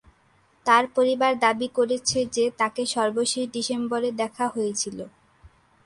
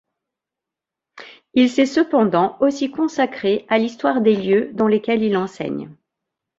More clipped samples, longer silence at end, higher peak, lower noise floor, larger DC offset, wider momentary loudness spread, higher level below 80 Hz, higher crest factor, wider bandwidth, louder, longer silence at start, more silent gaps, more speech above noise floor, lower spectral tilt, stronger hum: neither; second, 0.4 s vs 0.65 s; second, -6 dBFS vs -2 dBFS; second, -62 dBFS vs -86 dBFS; neither; about the same, 8 LU vs 8 LU; about the same, -62 dBFS vs -62 dBFS; about the same, 20 dB vs 16 dB; first, 11.5 kHz vs 7.8 kHz; second, -24 LUFS vs -19 LUFS; second, 0.65 s vs 1.15 s; neither; second, 38 dB vs 68 dB; second, -2.5 dB/octave vs -6 dB/octave; neither